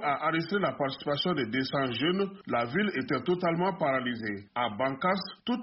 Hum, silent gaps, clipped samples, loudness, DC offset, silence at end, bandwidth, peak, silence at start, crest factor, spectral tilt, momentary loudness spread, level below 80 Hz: none; none; under 0.1%; -30 LUFS; under 0.1%; 0 s; 5.8 kHz; -16 dBFS; 0 s; 14 dB; -3.5 dB/octave; 4 LU; -66 dBFS